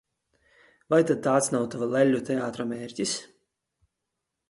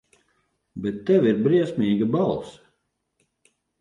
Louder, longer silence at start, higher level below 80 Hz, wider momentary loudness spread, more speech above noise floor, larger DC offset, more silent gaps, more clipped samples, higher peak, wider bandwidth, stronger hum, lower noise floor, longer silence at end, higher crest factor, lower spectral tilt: second, -26 LUFS vs -22 LUFS; first, 0.9 s vs 0.75 s; second, -68 dBFS vs -60 dBFS; second, 9 LU vs 13 LU; first, 58 dB vs 53 dB; neither; neither; neither; about the same, -8 dBFS vs -8 dBFS; first, 12 kHz vs 10.5 kHz; neither; first, -83 dBFS vs -74 dBFS; about the same, 1.25 s vs 1.3 s; about the same, 20 dB vs 16 dB; second, -4.5 dB/octave vs -8.5 dB/octave